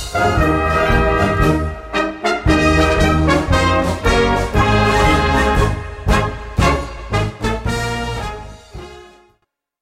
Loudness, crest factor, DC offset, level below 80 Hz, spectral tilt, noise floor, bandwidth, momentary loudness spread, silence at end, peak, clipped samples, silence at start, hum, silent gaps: -16 LUFS; 14 dB; under 0.1%; -24 dBFS; -5.5 dB/octave; -65 dBFS; 16 kHz; 9 LU; 0.75 s; -2 dBFS; under 0.1%; 0 s; none; none